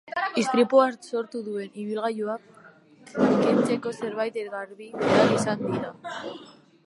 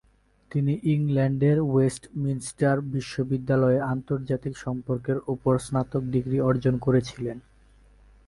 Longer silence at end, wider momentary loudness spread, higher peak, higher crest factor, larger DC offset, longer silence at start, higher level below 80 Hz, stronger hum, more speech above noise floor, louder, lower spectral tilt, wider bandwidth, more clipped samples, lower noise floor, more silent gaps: second, 0.35 s vs 0.85 s; first, 16 LU vs 9 LU; first, -6 dBFS vs -10 dBFS; about the same, 20 dB vs 16 dB; neither; second, 0.05 s vs 0.5 s; second, -68 dBFS vs -52 dBFS; neither; second, 27 dB vs 31 dB; about the same, -25 LUFS vs -26 LUFS; second, -5.5 dB/octave vs -7.5 dB/octave; about the same, 11.5 kHz vs 11.5 kHz; neither; second, -52 dBFS vs -56 dBFS; neither